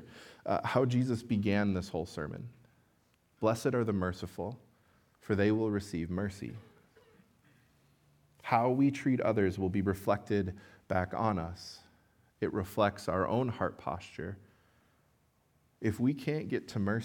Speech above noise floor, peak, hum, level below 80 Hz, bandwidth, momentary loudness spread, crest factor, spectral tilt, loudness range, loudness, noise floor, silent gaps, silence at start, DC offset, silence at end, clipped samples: 39 dB; -12 dBFS; none; -66 dBFS; 18 kHz; 16 LU; 22 dB; -7 dB/octave; 5 LU; -33 LUFS; -71 dBFS; none; 0 s; under 0.1%; 0 s; under 0.1%